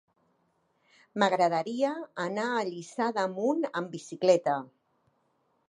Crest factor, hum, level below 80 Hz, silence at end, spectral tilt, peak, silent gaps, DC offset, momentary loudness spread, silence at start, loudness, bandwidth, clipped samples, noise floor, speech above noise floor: 22 dB; none; -84 dBFS; 1.05 s; -5 dB/octave; -10 dBFS; none; under 0.1%; 10 LU; 1.15 s; -29 LUFS; 10.5 kHz; under 0.1%; -73 dBFS; 44 dB